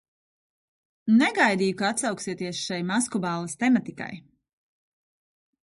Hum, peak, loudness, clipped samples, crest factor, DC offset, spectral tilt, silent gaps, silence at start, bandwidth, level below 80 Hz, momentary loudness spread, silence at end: none; -8 dBFS; -24 LUFS; under 0.1%; 20 dB; under 0.1%; -4 dB/octave; none; 1.05 s; 11.5 kHz; -70 dBFS; 15 LU; 1.45 s